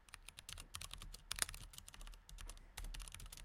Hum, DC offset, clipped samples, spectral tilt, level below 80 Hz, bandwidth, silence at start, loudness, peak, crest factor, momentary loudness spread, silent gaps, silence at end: none; under 0.1%; under 0.1%; -1 dB/octave; -56 dBFS; 17 kHz; 0 s; -50 LUFS; -14 dBFS; 36 dB; 15 LU; none; 0 s